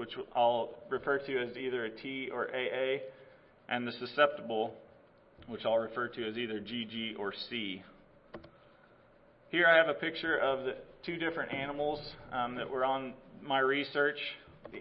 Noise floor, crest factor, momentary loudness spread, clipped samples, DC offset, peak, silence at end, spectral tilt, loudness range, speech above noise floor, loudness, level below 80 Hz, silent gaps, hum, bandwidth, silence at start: -62 dBFS; 24 dB; 12 LU; under 0.1%; under 0.1%; -10 dBFS; 0 s; -1.5 dB/octave; 6 LU; 29 dB; -33 LUFS; -68 dBFS; none; none; 5.6 kHz; 0 s